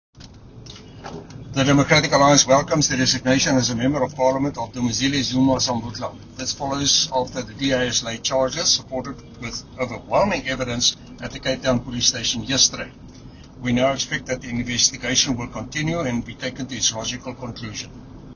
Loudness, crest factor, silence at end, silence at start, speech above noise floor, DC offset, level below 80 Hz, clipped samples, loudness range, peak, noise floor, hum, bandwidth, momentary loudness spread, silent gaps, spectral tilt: -20 LUFS; 22 dB; 0 s; 0.15 s; 21 dB; under 0.1%; -44 dBFS; under 0.1%; 5 LU; 0 dBFS; -42 dBFS; none; 7.4 kHz; 16 LU; none; -3 dB/octave